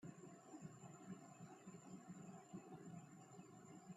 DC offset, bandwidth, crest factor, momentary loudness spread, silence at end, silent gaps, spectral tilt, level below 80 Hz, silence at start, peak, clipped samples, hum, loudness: under 0.1%; 13 kHz; 16 dB; 4 LU; 0 s; none; -6 dB/octave; under -90 dBFS; 0 s; -42 dBFS; under 0.1%; none; -60 LUFS